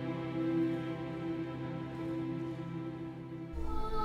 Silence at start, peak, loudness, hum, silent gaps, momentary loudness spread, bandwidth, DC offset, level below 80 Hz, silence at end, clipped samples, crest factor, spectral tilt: 0 s; -22 dBFS; -38 LUFS; none; none; 9 LU; 7.6 kHz; under 0.1%; -46 dBFS; 0 s; under 0.1%; 14 dB; -8.5 dB/octave